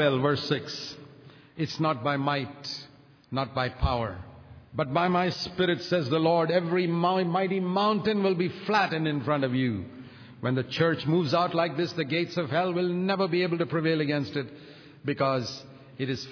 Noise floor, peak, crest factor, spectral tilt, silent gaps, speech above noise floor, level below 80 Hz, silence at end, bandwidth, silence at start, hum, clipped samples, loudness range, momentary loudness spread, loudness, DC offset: -51 dBFS; -10 dBFS; 18 dB; -6.5 dB/octave; none; 25 dB; -48 dBFS; 0 s; 5.4 kHz; 0 s; none; under 0.1%; 5 LU; 11 LU; -27 LUFS; under 0.1%